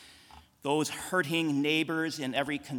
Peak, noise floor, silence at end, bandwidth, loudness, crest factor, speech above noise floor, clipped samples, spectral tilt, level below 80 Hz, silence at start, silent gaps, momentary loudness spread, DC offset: -14 dBFS; -56 dBFS; 0 s; 18 kHz; -30 LUFS; 18 dB; 26 dB; under 0.1%; -4 dB/octave; -68 dBFS; 0 s; none; 4 LU; under 0.1%